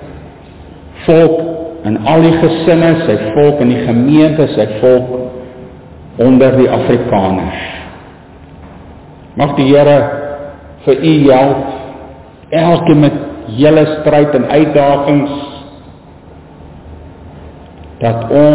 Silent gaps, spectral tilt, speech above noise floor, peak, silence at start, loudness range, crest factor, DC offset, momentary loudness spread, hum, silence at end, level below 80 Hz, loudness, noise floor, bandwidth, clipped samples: none; -11.5 dB/octave; 27 dB; 0 dBFS; 0 s; 5 LU; 12 dB; under 0.1%; 17 LU; none; 0 s; -38 dBFS; -10 LUFS; -35 dBFS; 4 kHz; under 0.1%